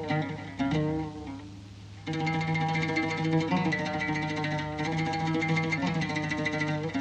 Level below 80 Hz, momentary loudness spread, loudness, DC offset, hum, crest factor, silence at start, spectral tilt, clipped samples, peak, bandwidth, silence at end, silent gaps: -54 dBFS; 11 LU; -29 LUFS; under 0.1%; none; 16 dB; 0 s; -6 dB/octave; under 0.1%; -14 dBFS; 8.8 kHz; 0 s; none